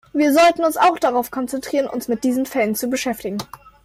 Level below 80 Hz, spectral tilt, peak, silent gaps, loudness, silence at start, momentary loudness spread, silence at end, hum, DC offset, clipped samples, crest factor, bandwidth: -56 dBFS; -4 dB/octave; -6 dBFS; none; -19 LUFS; 0.15 s; 12 LU; 0.15 s; none; under 0.1%; under 0.1%; 14 dB; 16 kHz